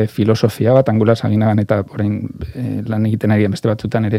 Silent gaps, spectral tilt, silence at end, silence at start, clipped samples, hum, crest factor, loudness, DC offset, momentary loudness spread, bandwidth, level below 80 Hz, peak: none; -8 dB/octave; 0 s; 0 s; under 0.1%; none; 14 dB; -16 LUFS; under 0.1%; 10 LU; 14 kHz; -46 dBFS; 0 dBFS